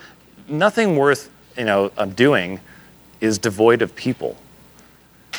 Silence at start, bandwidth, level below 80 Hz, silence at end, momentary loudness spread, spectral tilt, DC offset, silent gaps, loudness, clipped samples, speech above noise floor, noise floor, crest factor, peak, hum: 0.05 s; over 20 kHz; -60 dBFS; 0 s; 13 LU; -5 dB/octave; under 0.1%; none; -19 LUFS; under 0.1%; 31 dB; -49 dBFS; 20 dB; 0 dBFS; none